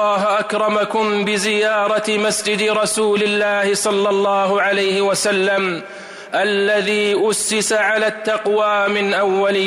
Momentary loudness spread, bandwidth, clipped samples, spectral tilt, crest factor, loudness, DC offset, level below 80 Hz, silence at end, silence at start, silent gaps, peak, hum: 2 LU; 15.5 kHz; under 0.1%; -3 dB/octave; 10 dB; -17 LUFS; under 0.1%; -64 dBFS; 0 s; 0 s; none; -8 dBFS; none